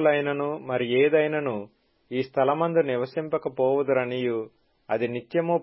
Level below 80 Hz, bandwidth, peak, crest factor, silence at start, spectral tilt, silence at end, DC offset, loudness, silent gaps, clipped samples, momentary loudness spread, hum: -70 dBFS; 5.8 kHz; -10 dBFS; 16 dB; 0 s; -10.5 dB/octave; 0 s; under 0.1%; -25 LUFS; none; under 0.1%; 10 LU; none